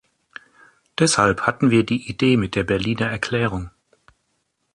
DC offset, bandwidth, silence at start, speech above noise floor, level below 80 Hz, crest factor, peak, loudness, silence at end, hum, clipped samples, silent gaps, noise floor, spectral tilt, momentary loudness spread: under 0.1%; 11.5 kHz; 1 s; 52 dB; -46 dBFS; 18 dB; -4 dBFS; -20 LUFS; 1.05 s; none; under 0.1%; none; -71 dBFS; -5 dB/octave; 8 LU